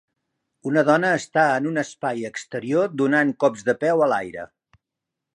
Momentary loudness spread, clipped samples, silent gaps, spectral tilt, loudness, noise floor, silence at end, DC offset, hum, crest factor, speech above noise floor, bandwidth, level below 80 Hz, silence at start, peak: 12 LU; under 0.1%; none; -5.5 dB/octave; -21 LUFS; -84 dBFS; 0.9 s; under 0.1%; none; 20 dB; 63 dB; 11 kHz; -68 dBFS; 0.65 s; -4 dBFS